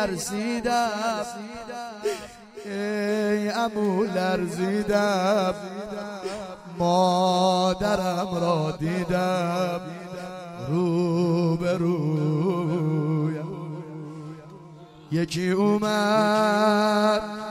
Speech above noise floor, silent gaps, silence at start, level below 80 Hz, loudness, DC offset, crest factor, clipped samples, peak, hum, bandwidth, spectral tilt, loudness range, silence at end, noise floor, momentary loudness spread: 22 dB; none; 0 s; -54 dBFS; -24 LUFS; under 0.1%; 16 dB; under 0.1%; -8 dBFS; none; 16 kHz; -6 dB/octave; 4 LU; 0 s; -45 dBFS; 15 LU